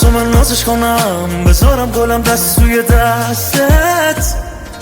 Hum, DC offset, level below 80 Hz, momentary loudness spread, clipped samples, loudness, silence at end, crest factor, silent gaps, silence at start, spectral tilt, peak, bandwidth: none; under 0.1%; -16 dBFS; 5 LU; under 0.1%; -11 LUFS; 0 s; 10 dB; none; 0 s; -4.5 dB/octave; 0 dBFS; over 20 kHz